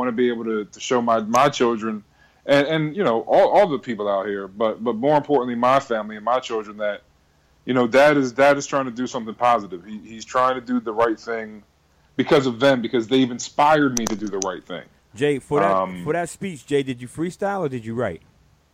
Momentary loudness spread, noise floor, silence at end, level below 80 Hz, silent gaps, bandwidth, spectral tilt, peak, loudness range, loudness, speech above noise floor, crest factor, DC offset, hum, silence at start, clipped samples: 13 LU; -59 dBFS; 0.55 s; -58 dBFS; none; 15 kHz; -5 dB/octave; -8 dBFS; 4 LU; -21 LUFS; 38 dB; 14 dB; under 0.1%; none; 0 s; under 0.1%